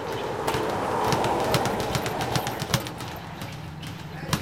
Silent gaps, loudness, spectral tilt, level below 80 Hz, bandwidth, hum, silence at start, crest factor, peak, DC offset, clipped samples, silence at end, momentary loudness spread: none; -27 LUFS; -4.5 dB/octave; -48 dBFS; 17 kHz; none; 0 s; 26 dB; -2 dBFS; 0.1%; under 0.1%; 0 s; 12 LU